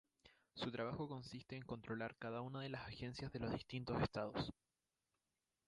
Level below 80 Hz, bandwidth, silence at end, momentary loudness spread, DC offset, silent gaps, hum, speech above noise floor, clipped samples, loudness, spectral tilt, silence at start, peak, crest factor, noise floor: -66 dBFS; 11 kHz; 1.15 s; 8 LU; under 0.1%; none; none; over 44 dB; under 0.1%; -47 LUFS; -6.5 dB/octave; 0.25 s; -26 dBFS; 22 dB; under -90 dBFS